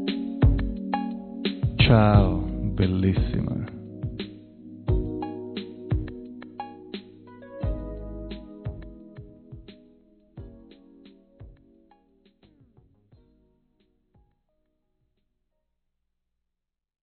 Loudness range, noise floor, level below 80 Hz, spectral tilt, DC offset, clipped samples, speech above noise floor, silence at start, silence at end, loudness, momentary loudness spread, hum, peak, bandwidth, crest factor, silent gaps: 21 LU; -83 dBFS; -36 dBFS; -6 dB/octave; under 0.1%; under 0.1%; 63 dB; 0 s; 5.5 s; -26 LUFS; 26 LU; 60 Hz at -50 dBFS; -4 dBFS; 4.5 kHz; 24 dB; none